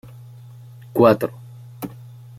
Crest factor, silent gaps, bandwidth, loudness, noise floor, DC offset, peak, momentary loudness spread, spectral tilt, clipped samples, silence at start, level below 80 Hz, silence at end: 22 dB; none; 16 kHz; -18 LUFS; -41 dBFS; under 0.1%; 0 dBFS; 26 LU; -7.5 dB/octave; under 0.1%; 0.95 s; -60 dBFS; 0.5 s